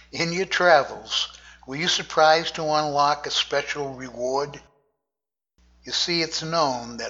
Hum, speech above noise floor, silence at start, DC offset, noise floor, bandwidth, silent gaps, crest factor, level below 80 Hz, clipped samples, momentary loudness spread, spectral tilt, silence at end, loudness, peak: none; 67 dB; 0.15 s; under 0.1%; -90 dBFS; 8 kHz; none; 20 dB; -58 dBFS; under 0.1%; 12 LU; -2.5 dB/octave; 0 s; -22 LUFS; -4 dBFS